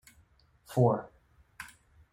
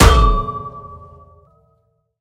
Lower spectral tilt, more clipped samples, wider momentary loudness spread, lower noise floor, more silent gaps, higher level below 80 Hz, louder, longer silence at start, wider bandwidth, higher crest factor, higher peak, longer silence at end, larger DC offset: first, -8 dB/octave vs -5 dB/octave; second, under 0.1% vs 0.2%; second, 21 LU vs 25 LU; about the same, -64 dBFS vs -63 dBFS; neither; second, -64 dBFS vs -20 dBFS; second, -29 LUFS vs -16 LUFS; first, 0.7 s vs 0 s; about the same, 15.5 kHz vs 16 kHz; first, 22 dB vs 16 dB; second, -12 dBFS vs 0 dBFS; second, 0.45 s vs 1.25 s; neither